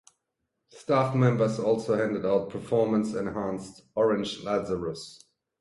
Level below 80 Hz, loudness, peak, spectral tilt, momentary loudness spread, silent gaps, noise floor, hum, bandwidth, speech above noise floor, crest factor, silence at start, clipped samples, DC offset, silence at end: -60 dBFS; -27 LUFS; -10 dBFS; -7 dB/octave; 12 LU; none; -81 dBFS; none; 11.5 kHz; 55 dB; 18 dB; 0.75 s; under 0.1%; under 0.1%; 0.45 s